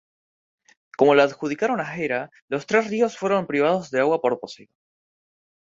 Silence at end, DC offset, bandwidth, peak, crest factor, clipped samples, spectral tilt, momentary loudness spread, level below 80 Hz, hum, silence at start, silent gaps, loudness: 0.95 s; under 0.1%; 7.6 kHz; -2 dBFS; 22 dB; under 0.1%; -5.5 dB/octave; 12 LU; -68 dBFS; none; 1 s; 2.42-2.48 s; -22 LUFS